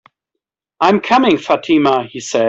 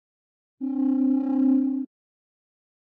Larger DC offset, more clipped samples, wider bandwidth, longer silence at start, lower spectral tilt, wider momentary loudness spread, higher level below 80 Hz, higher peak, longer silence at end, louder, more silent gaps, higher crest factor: neither; neither; first, 8 kHz vs 2.5 kHz; first, 0.8 s vs 0.6 s; second, -4.5 dB/octave vs -10 dB/octave; second, 6 LU vs 12 LU; first, -56 dBFS vs -84 dBFS; first, -2 dBFS vs -14 dBFS; second, 0 s vs 1 s; first, -14 LUFS vs -24 LUFS; neither; about the same, 14 dB vs 12 dB